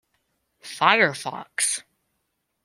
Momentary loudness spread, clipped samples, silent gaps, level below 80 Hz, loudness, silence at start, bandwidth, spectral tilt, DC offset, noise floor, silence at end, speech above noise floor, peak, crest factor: 15 LU; under 0.1%; none; -74 dBFS; -22 LUFS; 0.65 s; 16 kHz; -1.5 dB/octave; under 0.1%; -76 dBFS; 0.85 s; 54 dB; -2 dBFS; 24 dB